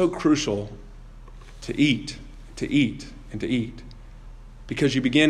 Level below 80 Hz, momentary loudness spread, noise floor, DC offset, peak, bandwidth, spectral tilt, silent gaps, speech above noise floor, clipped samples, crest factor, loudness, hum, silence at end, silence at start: -44 dBFS; 20 LU; -42 dBFS; under 0.1%; -6 dBFS; 10.5 kHz; -5 dB/octave; none; 19 dB; under 0.1%; 18 dB; -24 LUFS; none; 0 s; 0 s